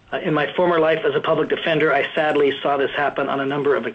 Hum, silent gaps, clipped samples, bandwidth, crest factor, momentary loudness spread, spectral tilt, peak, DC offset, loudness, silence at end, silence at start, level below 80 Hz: none; none; under 0.1%; 7.8 kHz; 14 dB; 4 LU; -7 dB/octave; -6 dBFS; under 0.1%; -19 LUFS; 0 s; 0.1 s; -58 dBFS